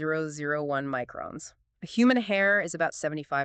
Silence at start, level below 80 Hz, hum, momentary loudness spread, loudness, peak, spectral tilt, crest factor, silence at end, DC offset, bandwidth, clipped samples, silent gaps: 0 s; -68 dBFS; none; 16 LU; -27 LUFS; -12 dBFS; -5 dB/octave; 16 dB; 0 s; under 0.1%; 9 kHz; under 0.1%; none